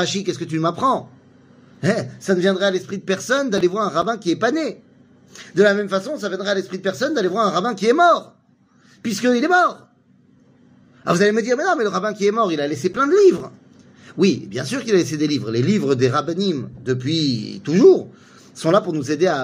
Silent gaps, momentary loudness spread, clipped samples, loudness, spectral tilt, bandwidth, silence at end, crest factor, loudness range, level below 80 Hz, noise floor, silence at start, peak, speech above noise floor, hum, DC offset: none; 10 LU; under 0.1%; -19 LUFS; -5.5 dB/octave; 15.5 kHz; 0 s; 18 dB; 3 LU; -62 dBFS; -56 dBFS; 0 s; -2 dBFS; 37 dB; none; under 0.1%